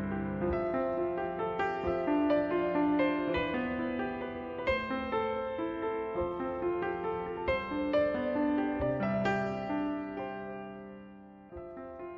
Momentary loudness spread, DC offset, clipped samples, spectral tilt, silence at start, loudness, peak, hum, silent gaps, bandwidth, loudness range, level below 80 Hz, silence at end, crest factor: 14 LU; under 0.1%; under 0.1%; -8 dB/octave; 0 s; -33 LUFS; -18 dBFS; none; none; 7.2 kHz; 3 LU; -54 dBFS; 0 s; 16 dB